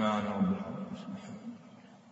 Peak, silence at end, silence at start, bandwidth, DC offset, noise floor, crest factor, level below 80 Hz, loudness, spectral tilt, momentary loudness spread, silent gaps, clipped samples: -16 dBFS; 0 s; 0 s; 8 kHz; under 0.1%; -55 dBFS; 18 dB; -68 dBFS; -36 LUFS; -6 dB/octave; 21 LU; none; under 0.1%